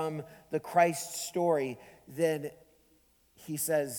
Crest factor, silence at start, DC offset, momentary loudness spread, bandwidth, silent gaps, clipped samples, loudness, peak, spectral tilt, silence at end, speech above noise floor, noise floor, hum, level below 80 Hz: 20 dB; 0 s; under 0.1%; 17 LU; 19.5 kHz; none; under 0.1%; -31 LUFS; -12 dBFS; -4.5 dB/octave; 0 s; 35 dB; -67 dBFS; none; -72 dBFS